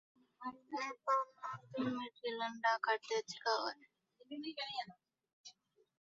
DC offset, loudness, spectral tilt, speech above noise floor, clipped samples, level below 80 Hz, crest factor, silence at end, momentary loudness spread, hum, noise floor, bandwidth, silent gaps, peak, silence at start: under 0.1%; -40 LUFS; -1 dB/octave; 26 dB; under 0.1%; -90 dBFS; 20 dB; 0.5 s; 17 LU; none; -66 dBFS; 7.4 kHz; 5.33-5.44 s; -20 dBFS; 0.4 s